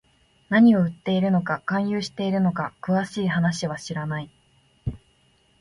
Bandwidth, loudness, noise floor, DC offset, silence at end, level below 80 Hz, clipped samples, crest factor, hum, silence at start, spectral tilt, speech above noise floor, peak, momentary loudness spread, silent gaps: 11.5 kHz; -23 LUFS; -62 dBFS; under 0.1%; 0.65 s; -52 dBFS; under 0.1%; 16 dB; none; 0.5 s; -6.5 dB/octave; 40 dB; -8 dBFS; 17 LU; none